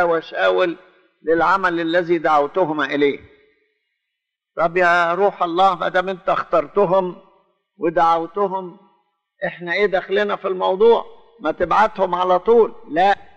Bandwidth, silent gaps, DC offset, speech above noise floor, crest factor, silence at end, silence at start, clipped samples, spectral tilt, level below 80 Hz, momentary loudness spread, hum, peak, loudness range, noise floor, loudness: 8.2 kHz; none; under 0.1%; 62 dB; 14 dB; 0.15 s; 0 s; under 0.1%; -6 dB/octave; -52 dBFS; 11 LU; none; -4 dBFS; 3 LU; -80 dBFS; -18 LUFS